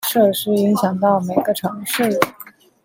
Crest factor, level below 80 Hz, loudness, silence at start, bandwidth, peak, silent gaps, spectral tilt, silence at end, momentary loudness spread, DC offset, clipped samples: 18 dB; -62 dBFS; -18 LUFS; 0 s; 17 kHz; 0 dBFS; none; -5 dB/octave; 0.35 s; 6 LU; under 0.1%; under 0.1%